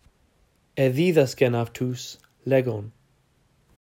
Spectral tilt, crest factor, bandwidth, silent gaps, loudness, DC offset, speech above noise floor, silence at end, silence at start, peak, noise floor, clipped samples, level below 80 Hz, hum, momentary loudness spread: -6.5 dB/octave; 20 dB; 16 kHz; none; -24 LUFS; under 0.1%; 41 dB; 1.05 s; 0.75 s; -6 dBFS; -64 dBFS; under 0.1%; -64 dBFS; none; 17 LU